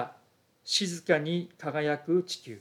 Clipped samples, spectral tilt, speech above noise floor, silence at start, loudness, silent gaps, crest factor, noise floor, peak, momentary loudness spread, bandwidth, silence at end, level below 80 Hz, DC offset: under 0.1%; -4 dB/octave; 36 dB; 0 s; -29 LUFS; none; 20 dB; -65 dBFS; -10 dBFS; 10 LU; 15.5 kHz; 0 s; -84 dBFS; under 0.1%